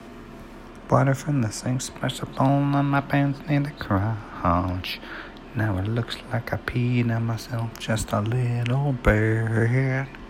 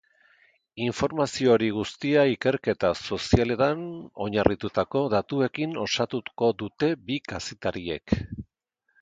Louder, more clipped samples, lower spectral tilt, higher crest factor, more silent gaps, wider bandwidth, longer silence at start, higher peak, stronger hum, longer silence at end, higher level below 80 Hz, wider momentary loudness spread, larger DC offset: about the same, -25 LUFS vs -26 LUFS; neither; about the same, -6.5 dB/octave vs -5.5 dB/octave; about the same, 20 dB vs 24 dB; neither; first, 16 kHz vs 9.4 kHz; second, 0 s vs 0.75 s; about the same, -4 dBFS vs -2 dBFS; neither; second, 0 s vs 0.6 s; first, -40 dBFS vs -46 dBFS; about the same, 10 LU vs 10 LU; neither